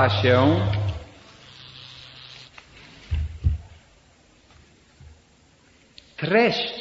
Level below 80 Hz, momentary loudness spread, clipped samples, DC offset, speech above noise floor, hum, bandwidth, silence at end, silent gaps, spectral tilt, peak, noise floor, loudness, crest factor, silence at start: -38 dBFS; 27 LU; under 0.1%; under 0.1%; 37 dB; none; 7.8 kHz; 0 s; none; -7 dB/octave; -4 dBFS; -57 dBFS; -22 LUFS; 22 dB; 0 s